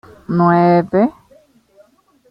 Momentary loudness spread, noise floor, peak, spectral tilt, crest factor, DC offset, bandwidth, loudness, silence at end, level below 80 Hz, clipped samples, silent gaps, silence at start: 8 LU; -52 dBFS; -2 dBFS; -10 dB/octave; 16 dB; under 0.1%; 5.4 kHz; -14 LUFS; 1.2 s; -54 dBFS; under 0.1%; none; 0.3 s